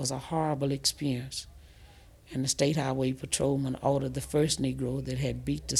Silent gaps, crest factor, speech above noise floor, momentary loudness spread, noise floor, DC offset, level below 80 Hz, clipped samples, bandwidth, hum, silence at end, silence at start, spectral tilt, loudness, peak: none; 18 dB; 24 dB; 7 LU; -54 dBFS; under 0.1%; -50 dBFS; under 0.1%; 14.5 kHz; none; 0 s; 0 s; -4.5 dB/octave; -30 LUFS; -12 dBFS